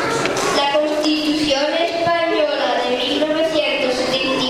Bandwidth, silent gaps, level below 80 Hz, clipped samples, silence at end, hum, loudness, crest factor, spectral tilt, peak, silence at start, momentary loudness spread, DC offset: 15 kHz; none; -50 dBFS; under 0.1%; 0 s; none; -17 LUFS; 16 dB; -3 dB/octave; -2 dBFS; 0 s; 1 LU; under 0.1%